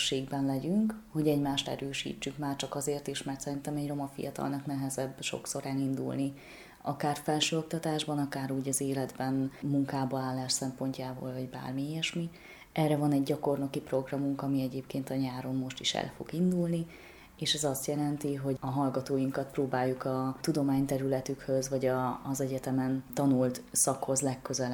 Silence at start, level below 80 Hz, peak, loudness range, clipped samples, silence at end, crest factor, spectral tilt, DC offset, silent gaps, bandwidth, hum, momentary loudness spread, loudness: 0 s; -62 dBFS; -14 dBFS; 4 LU; under 0.1%; 0 s; 18 dB; -4.5 dB/octave; under 0.1%; none; 19 kHz; none; 8 LU; -32 LUFS